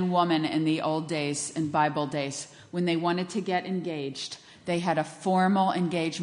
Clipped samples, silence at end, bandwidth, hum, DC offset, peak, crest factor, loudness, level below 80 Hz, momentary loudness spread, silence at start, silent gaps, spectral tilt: under 0.1%; 0 s; 10.5 kHz; none; under 0.1%; -10 dBFS; 16 dB; -28 LUFS; -72 dBFS; 10 LU; 0 s; none; -5 dB/octave